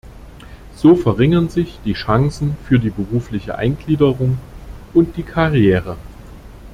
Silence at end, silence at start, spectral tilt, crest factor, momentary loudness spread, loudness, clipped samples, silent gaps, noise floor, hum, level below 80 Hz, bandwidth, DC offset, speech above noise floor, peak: 0 s; 0.05 s; -8.5 dB/octave; 16 dB; 11 LU; -17 LUFS; under 0.1%; none; -37 dBFS; none; -36 dBFS; 13 kHz; under 0.1%; 22 dB; -2 dBFS